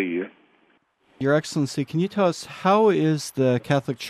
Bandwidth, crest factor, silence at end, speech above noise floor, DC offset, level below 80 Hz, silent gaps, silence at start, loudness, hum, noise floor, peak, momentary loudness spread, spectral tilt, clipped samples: 14.5 kHz; 16 dB; 0 s; 42 dB; under 0.1%; -66 dBFS; none; 0 s; -23 LUFS; none; -63 dBFS; -8 dBFS; 9 LU; -6 dB/octave; under 0.1%